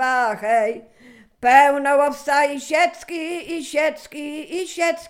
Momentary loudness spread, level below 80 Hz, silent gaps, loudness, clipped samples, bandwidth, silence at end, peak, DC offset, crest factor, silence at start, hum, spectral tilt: 15 LU; -62 dBFS; none; -19 LUFS; under 0.1%; 16 kHz; 0 s; -2 dBFS; under 0.1%; 18 dB; 0 s; none; -2 dB/octave